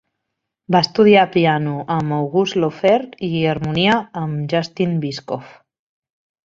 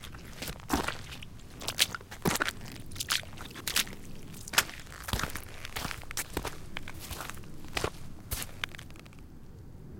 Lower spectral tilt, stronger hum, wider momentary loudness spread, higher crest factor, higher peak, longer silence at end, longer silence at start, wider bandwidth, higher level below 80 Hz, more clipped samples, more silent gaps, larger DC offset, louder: first, -6.5 dB/octave vs -2 dB/octave; neither; second, 12 LU vs 19 LU; second, 16 dB vs 32 dB; about the same, -2 dBFS vs -4 dBFS; first, 1 s vs 0 s; first, 0.7 s vs 0 s; second, 7.6 kHz vs 17 kHz; second, -54 dBFS vs -46 dBFS; neither; neither; neither; first, -17 LUFS vs -34 LUFS